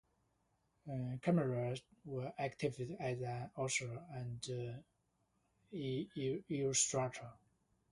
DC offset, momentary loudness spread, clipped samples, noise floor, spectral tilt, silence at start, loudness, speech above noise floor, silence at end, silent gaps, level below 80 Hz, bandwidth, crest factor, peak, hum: under 0.1%; 13 LU; under 0.1%; -81 dBFS; -4.5 dB/octave; 0.85 s; -40 LUFS; 40 dB; 0.6 s; none; -72 dBFS; 11.5 kHz; 22 dB; -20 dBFS; none